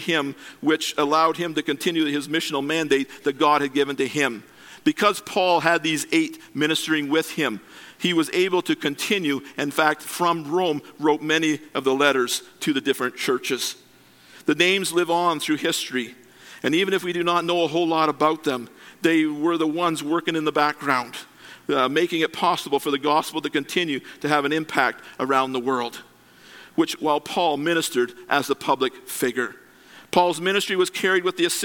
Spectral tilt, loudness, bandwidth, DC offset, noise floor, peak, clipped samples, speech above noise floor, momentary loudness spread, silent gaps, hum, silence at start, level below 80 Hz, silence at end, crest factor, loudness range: -3.5 dB/octave; -22 LUFS; 17.5 kHz; under 0.1%; -52 dBFS; -2 dBFS; under 0.1%; 30 dB; 7 LU; none; none; 0 s; -72 dBFS; 0 s; 22 dB; 2 LU